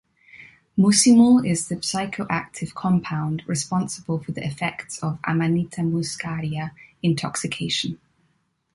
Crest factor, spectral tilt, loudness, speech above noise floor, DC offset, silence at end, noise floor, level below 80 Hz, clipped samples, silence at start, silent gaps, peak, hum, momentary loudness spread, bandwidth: 18 dB; -4.5 dB/octave; -22 LUFS; 46 dB; under 0.1%; 0.8 s; -68 dBFS; -58 dBFS; under 0.1%; 0.35 s; none; -4 dBFS; none; 14 LU; 11.5 kHz